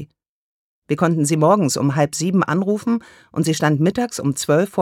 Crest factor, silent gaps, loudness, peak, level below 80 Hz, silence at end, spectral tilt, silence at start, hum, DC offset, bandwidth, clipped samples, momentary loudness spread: 16 dB; 0.28-0.82 s; -19 LUFS; -2 dBFS; -60 dBFS; 0 s; -5.5 dB/octave; 0 s; none; under 0.1%; 16.5 kHz; under 0.1%; 7 LU